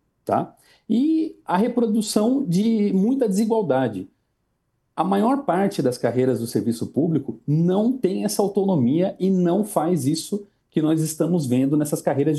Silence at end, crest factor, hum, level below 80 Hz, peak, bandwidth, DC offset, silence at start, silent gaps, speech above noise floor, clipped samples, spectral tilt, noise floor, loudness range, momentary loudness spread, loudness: 0 s; 16 dB; none; -66 dBFS; -6 dBFS; 12.5 kHz; under 0.1%; 0.25 s; none; 51 dB; under 0.1%; -6.5 dB/octave; -72 dBFS; 2 LU; 5 LU; -22 LUFS